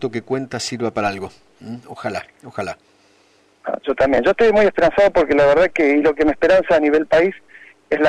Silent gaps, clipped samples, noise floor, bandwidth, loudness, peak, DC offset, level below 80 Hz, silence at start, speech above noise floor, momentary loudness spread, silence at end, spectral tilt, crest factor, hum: none; under 0.1%; -56 dBFS; 10.5 kHz; -16 LUFS; -8 dBFS; under 0.1%; -44 dBFS; 0 s; 39 dB; 17 LU; 0 s; -5 dB/octave; 10 dB; none